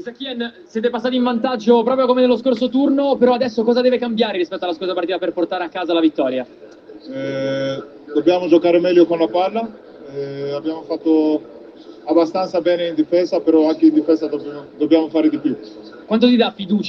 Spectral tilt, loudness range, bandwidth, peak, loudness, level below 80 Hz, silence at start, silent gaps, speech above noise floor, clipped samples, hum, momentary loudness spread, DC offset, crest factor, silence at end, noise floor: -6.5 dB/octave; 5 LU; 6.4 kHz; 0 dBFS; -17 LUFS; -64 dBFS; 0 s; none; 22 dB; under 0.1%; none; 13 LU; under 0.1%; 16 dB; 0 s; -39 dBFS